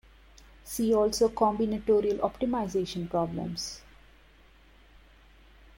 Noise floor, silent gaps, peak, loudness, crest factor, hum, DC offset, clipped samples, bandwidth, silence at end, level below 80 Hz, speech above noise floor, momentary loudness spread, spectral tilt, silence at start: -57 dBFS; none; -12 dBFS; -28 LUFS; 18 dB; none; under 0.1%; under 0.1%; 16.5 kHz; 2 s; -54 dBFS; 30 dB; 11 LU; -5.5 dB/octave; 0.65 s